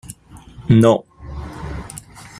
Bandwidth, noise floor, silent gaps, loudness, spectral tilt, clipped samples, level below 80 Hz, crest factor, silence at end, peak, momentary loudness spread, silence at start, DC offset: 14.5 kHz; -41 dBFS; none; -15 LUFS; -7.5 dB/octave; under 0.1%; -38 dBFS; 18 dB; 0.4 s; -2 dBFS; 23 LU; 0.1 s; under 0.1%